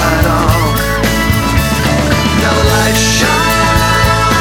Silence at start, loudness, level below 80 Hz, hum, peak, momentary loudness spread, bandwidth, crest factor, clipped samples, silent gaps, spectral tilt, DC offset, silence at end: 0 s; -11 LUFS; -20 dBFS; none; 0 dBFS; 3 LU; over 20 kHz; 10 dB; under 0.1%; none; -4 dB/octave; under 0.1%; 0 s